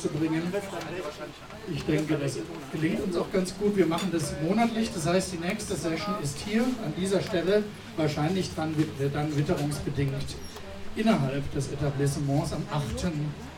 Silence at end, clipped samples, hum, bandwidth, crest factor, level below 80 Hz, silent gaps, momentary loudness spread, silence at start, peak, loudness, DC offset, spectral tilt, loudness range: 0 s; under 0.1%; none; 17 kHz; 18 dB; -48 dBFS; none; 10 LU; 0 s; -10 dBFS; -29 LUFS; under 0.1%; -6 dB/octave; 2 LU